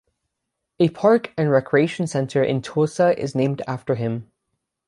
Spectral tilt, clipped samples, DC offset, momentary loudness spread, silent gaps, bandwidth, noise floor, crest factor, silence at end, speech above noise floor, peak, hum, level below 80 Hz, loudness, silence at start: -7 dB/octave; under 0.1%; under 0.1%; 7 LU; none; 11.5 kHz; -80 dBFS; 16 dB; 0.65 s; 60 dB; -4 dBFS; none; -62 dBFS; -21 LUFS; 0.8 s